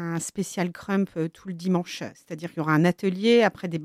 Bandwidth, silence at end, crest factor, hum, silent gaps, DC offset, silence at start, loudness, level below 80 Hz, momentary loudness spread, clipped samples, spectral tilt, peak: 15 kHz; 0 s; 18 dB; none; none; under 0.1%; 0 s; -25 LUFS; -66 dBFS; 14 LU; under 0.1%; -5.5 dB/octave; -8 dBFS